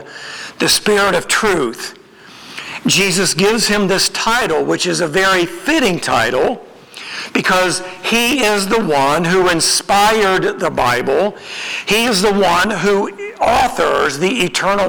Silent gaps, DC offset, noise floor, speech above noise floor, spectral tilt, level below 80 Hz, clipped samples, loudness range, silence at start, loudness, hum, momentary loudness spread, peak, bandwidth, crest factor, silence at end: none; under 0.1%; -39 dBFS; 24 dB; -3 dB/octave; -42 dBFS; under 0.1%; 2 LU; 0 s; -14 LUFS; none; 10 LU; 0 dBFS; over 20 kHz; 14 dB; 0 s